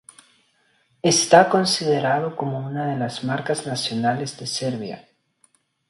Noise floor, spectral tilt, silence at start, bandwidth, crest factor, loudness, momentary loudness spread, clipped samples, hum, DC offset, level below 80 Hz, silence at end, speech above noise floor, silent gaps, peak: -64 dBFS; -4 dB/octave; 1.05 s; 11.5 kHz; 22 dB; -21 LUFS; 13 LU; under 0.1%; none; under 0.1%; -66 dBFS; 0.9 s; 43 dB; none; 0 dBFS